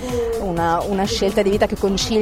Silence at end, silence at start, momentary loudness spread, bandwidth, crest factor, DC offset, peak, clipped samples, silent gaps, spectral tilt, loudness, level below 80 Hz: 0 s; 0 s; 4 LU; 16.5 kHz; 14 dB; under 0.1%; -4 dBFS; under 0.1%; none; -4.5 dB/octave; -19 LUFS; -34 dBFS